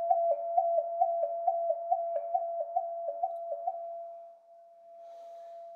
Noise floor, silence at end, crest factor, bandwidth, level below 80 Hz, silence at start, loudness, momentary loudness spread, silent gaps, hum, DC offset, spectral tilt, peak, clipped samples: -56 dBFS; 0 s; 18 dB; 2.4 kHz; under -90 dBFS; 0 s; -32 LUFS; 19 LU; none; none; under 0.1%; -3.5 dB/octave; -14 dBFS; under 0.1%